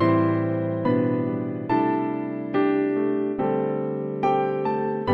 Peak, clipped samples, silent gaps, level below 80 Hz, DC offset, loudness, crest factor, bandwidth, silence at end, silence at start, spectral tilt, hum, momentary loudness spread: -8 dBFS; under 0.1%; none; -60 dBFS; under 0.1%; -24 LUFS; 14 dB; 5.6 kHz; 0 s; 0 s; -10 dB/octave; none; 5 LU